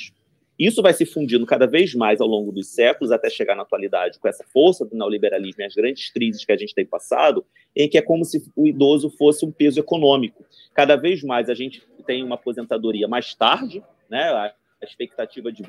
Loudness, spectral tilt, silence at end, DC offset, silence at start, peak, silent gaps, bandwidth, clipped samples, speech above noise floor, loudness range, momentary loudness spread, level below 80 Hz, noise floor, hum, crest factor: -20 LUFS; -5 dB/octave; 0 s; under 0.1%; 0 s; 0 dBFS; none; 15 kHz; under 0.1%; 45 dB; 5 LU; 12 LU; -74 dBFS; -65 dBFS; none; 20 dB